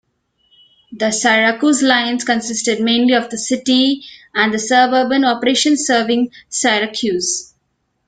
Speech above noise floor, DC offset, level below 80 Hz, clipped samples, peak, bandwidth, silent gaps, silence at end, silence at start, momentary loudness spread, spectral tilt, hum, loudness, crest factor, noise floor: 52 dB; under 0.1%; -60 dBFS; under 0.1%; 0 dBFS; 9.6 kHz; none; 0.65 s; 0.9 s; 7 LU; -2 dB/octave; none; -15 LUFS; 16 dB; -68 dBFS